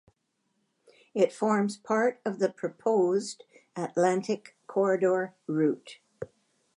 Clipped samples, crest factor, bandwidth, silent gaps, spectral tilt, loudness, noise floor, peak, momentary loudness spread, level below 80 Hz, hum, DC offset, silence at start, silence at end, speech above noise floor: under 0.1%; 18 dB; 11 kHz; none; -6 dB/octave; -28 LUFS; -77 dBFS; -12 dBFS; 17 LU; -78 dBFS; none; under 0.1%; 1.15 s; 0.5 s; 49 dB